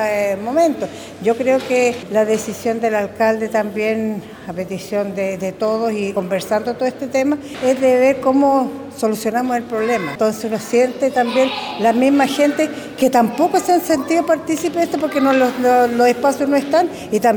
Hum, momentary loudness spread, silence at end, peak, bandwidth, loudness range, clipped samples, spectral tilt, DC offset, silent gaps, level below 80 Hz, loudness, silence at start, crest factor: none; 7 LU; 0 s; -2 dBFS; over 20 kHz; 4 LU; under 0.1%; -4.5 dB/octave; under 0.1%; none; -56 dBFS; -17 LUFS; 0 s; 16 dB